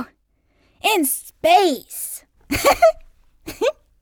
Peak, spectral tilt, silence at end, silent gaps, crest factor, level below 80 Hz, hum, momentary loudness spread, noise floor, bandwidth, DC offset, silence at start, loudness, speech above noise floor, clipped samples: -4 dBFS; -2.5 dB/octave; 0.3 s; none; 18 dB; -46 dBFS; none; 21 LU; -63 dBFS; over 20 kHz; under 0.1%; 0 s; -19 LUFS; 46 dB; under 0.1%